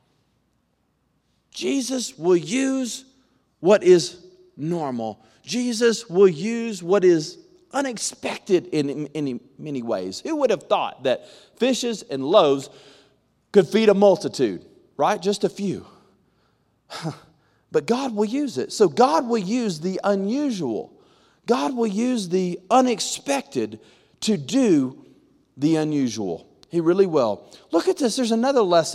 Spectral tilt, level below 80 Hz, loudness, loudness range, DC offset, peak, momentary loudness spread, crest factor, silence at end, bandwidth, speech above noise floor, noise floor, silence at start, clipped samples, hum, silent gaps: -5 dB/octave; -70 dBFS; -22 LUFS; 5 LU; under 0.1%; -2 dBFS; 13 LU; 20 dB; 0 s; 13.5 kHz; 47 dB; -69 dBFS; 1.55 s; under 0.1%; none; none